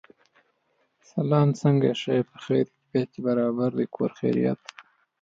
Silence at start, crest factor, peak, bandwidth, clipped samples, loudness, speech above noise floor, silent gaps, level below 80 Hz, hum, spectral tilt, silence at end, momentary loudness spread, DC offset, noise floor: 1.15 s; 18 dB; -8 dBFS; 7.6 kHz; under 0.1%; -25 LUFS; 47 dB; none; -70 dBFS; none; -8 dB/octave; 0.4 s; 7 LU; under 0.1%; -71 dBFS